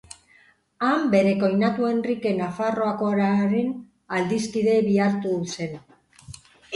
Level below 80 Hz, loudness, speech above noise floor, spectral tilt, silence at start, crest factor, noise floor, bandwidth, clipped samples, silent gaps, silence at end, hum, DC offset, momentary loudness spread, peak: -62 dBFS; -23 LUFS; 36 dB; -6.5 dB/octave; 0.8 s; 16 dB; -58 dBFS; 11.5 kHz; under 0.1%; none; 0 s; none; under 0.1%; 10 LU; -6 dBFS